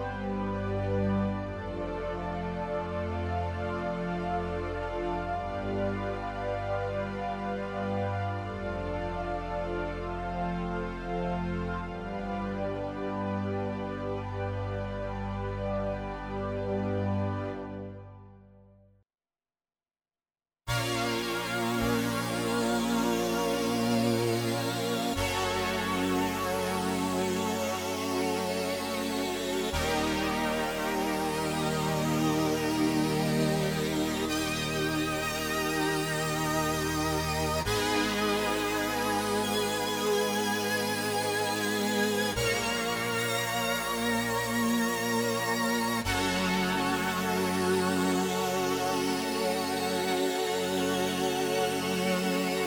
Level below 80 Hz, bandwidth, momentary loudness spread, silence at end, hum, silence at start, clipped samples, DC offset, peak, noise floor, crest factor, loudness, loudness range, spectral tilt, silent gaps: -48 dBFS; over 20 kHz; 7 LU; 0 s; none; 0 s; under 0.1%; under 0.1%; -14 dBFS; under -90 dBFS; 16 dB; -30 LUFS; 6 LU; -4.5 dB/octave; none